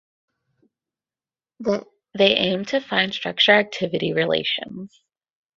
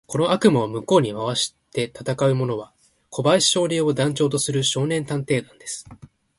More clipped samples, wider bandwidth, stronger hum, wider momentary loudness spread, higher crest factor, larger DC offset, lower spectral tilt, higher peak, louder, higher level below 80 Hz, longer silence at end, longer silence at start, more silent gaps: neither; second, 7.6 kHz vs 11.5 kHz; neither; about the same, 13 LU vs 12 LU; about the same, 22 dB vs 20 dB; neither; about the same, -4.5 dB/octave vs -4.5 dB/octave; about the same, -2 dBFS vs -2 dBFS; about the same, -20 LUFS vs -21 LUFS; second, -64 dBFS vs -58 dBFS; first, 0.7 s vs 0.3 s; first, 1.6 s vs 0.1 s; neither